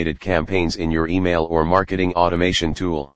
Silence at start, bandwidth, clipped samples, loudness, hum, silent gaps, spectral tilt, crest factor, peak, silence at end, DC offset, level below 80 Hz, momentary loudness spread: 0 s; 9.6 kHz; under 0.1%; -19 LUFS; none; none; -5.5 dB/octave; 18 dB; 0 dBFS; 0 s; 2%; -36 dBFS; 4 LU